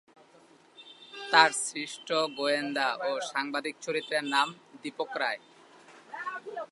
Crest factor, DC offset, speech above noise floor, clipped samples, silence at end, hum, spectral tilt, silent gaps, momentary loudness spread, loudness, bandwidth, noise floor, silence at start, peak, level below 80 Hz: 26 dB; under 0.1%; 30 dB; under 0.1%; 0.05 s; none; -1.5 dB/octave; none; 18 LU; -29 LUFS; 11.5 kHz; -59 dBFS; 0.8 s; -4 dBFS; -90 dBFS